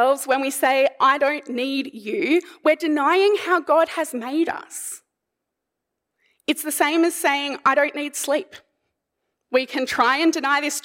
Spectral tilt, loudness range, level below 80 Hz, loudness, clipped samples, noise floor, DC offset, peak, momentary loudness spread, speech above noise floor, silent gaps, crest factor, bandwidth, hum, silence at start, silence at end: -1.5 dB/octave; 5 LU; -72 dBFS; -21 LUFS; under 0.1%; -81 dBFS; under 0.1%; -4 dBFS; 9 LU; 61 dB; none; 16 dB; 16.5 kHz; none; 0 s; 0.05 s